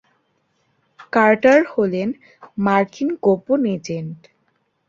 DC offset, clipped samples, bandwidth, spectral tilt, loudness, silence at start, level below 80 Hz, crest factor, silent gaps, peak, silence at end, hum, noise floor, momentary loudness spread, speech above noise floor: under 0.1%; under 0.1%; 7.6 kHz; -7 dB/octave; -18 LUFS; 1 s; -62 dBFS; 18 dB; none; -2 dBFS; 0.75 s; none; -67 dBFS; 15 LU; 49 dB